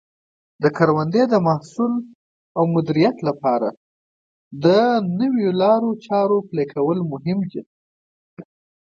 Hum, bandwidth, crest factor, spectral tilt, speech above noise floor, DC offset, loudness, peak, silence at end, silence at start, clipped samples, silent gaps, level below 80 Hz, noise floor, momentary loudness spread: none; 7.6 kHz; 20 dB; -8 dB/octave; over 72 dB; under 0.1%; -19 LUFS; -2 dBFS; 0.4 s; 0.6 s; under 0.1%; 2.15-2.55 s, 3.77-4.51 s, 7.66-8.37 s; -66 dBFS; under -90 dBFS; 8 LU